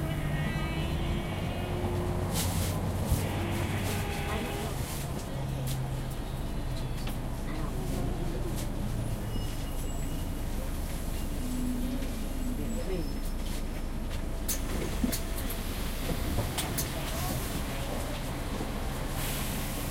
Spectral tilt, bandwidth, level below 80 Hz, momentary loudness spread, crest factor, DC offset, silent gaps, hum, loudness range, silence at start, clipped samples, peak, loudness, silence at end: -5 dB/octave; 16 kHz; -36 dBFS; 5 LU; 16 dB; under 0.1%; none; none; 4 LU; 0 s; under 0.1%; -14 dBFS; -34 LUFS; 0 s